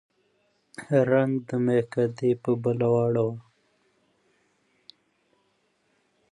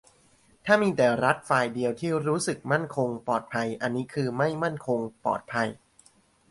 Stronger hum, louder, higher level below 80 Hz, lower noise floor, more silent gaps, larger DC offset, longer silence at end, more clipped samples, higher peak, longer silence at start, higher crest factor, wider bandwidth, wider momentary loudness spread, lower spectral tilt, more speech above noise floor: neither; about the same, -25 LUFS vs -27 LUFS; about the same, -70 dBFS vs -66 dBFS; first, -70 dBFS vs -61 dBFS; neither; neither; first, 2.95 s vs 0.75 s; neither; about the same, -8 dBFS vs -6 dBFS; first, 0.8 s vs 0.65 s; about the same, 20 dB vs 20 dB; about the same, 11 kHz vs 11.5 kHz; about the same, 9 LU vs 7 LU; first, -8.5 dB/octave vs -5.5 dB/octave; first, 46 dB vs 35 dB